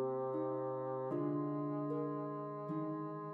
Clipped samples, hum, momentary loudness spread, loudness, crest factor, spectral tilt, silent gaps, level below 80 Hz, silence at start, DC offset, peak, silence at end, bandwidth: under 0.1%; none; 4 LU; -40 LUFS; 12 dB; -11.5 dB/octave; none; under -90 dBFS; 0 s; under 0.1%; -28 dBFS; 0 s; 4.2 kHz